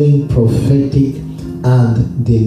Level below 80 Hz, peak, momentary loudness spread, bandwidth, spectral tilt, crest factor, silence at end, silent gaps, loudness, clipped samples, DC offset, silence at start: -30 dBFS; 0 dBFS; 7 LU; 10 kHz; -9.5 dB/octave; 12 dB; 0 s; none; -13 LUFS; under 0.1%; under 0.1%; 0 s